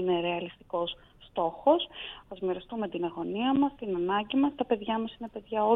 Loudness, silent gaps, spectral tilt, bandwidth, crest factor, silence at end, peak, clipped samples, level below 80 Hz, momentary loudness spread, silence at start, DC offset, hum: -30 LUFS; none; -8.5 dB/octave; 4 kHz; 20 dB; 0 s; -10 dBFS; under 0.1%; -60 dBFS; 11 LU; 0 s; under 0.1%; none